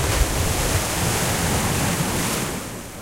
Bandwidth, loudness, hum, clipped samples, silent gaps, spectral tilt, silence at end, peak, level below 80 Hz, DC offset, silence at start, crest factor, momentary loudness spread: 16 kHz; -21 LUFS; none; under 0.1%; none; -3.5 dB/octave; 0 s; -6 dBFS; -30 dBFS; under 0.1%; 0 s; 16 dB; 5 LU